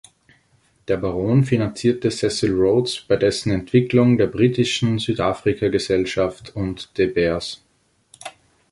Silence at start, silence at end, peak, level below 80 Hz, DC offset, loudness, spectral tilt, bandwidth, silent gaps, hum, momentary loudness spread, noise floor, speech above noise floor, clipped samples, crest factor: 0.9 s; 0.4 s; -2 dBFS; -46 dBFS; under 0.1%; -20 LUFS; -6 dB/octave; 11.5 kHz; none; none; 11 LU; -60 dBFS; 41 dB; under 0.1%; 18 dB